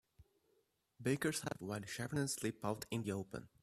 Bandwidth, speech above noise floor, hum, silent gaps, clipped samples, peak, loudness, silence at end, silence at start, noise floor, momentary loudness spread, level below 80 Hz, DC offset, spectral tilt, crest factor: 15.5 kHz; 38 dB; none; none; under 0.1%; -24 dBFS; -41 LUFS; 0.15 s; 0.2 s; -79 dBFS; 7 LU; -72 dBFS; under 0.1%; -4.5 dB/octave; 20 dB